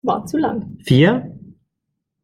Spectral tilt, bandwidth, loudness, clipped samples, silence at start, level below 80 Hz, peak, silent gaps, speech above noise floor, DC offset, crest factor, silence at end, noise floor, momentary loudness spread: -7 dB/octave; 14 kHz; -17 LUFS; under 0.1%; 0.05 s; -50 dBFS; -2 dBFS; none; 61 dB; under 0.1%; 18 dB; 0.85 s; -77 dBFS; 13 LU